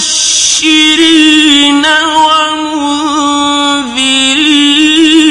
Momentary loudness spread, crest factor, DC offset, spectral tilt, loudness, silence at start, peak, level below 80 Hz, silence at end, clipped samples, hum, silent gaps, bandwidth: 7 LU; 8 dB; under 0.1%; 0 dB/octave; -6 LUFS; 0 s; 0 dBFS; -44 dBFS; 0 s; 1%; none; none; 12 kHz